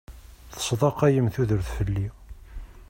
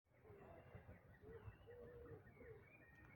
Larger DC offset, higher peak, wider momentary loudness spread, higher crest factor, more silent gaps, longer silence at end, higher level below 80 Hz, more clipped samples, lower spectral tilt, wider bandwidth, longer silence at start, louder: neither; first, -8 dBFS vs -46 dBFS; first, 23 LU vs 5 LU; about the same, 18 dB vs 16 dB; neither; about the same, 0.05 s vs 0 s; first, -40 dBFS vs -72 dBFS; neither; second, -6 dB/octave vs -8 dB/octave; about the same, 16.5 kHz vs 17 kHz; about the same, 0.1 s vs 0.05 s; first, -25 LUFS vs -63 LUFS